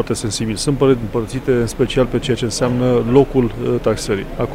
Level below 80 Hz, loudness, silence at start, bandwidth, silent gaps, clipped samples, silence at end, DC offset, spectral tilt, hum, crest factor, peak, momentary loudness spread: -32 dBFS; -17 LUFS; 0 s; 16 kHz; none; under 0.1%; 0 s; under 0.1%; -5.5 dB/octave; none; 16 dB; 0 dBFS; 7 LU